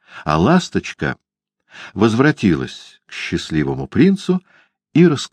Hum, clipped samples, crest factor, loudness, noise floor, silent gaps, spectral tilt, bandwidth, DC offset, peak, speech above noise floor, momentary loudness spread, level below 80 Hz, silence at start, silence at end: none; under 0.1%; 16 dB; -17 LUFS; -54 dBFS; none; -6.5 dB/octave; 9.8 kHz; under 0.1%; 0 dBFS; 38 dB; 16 LU; -44 dBFS; 0.15 s; 0.05 s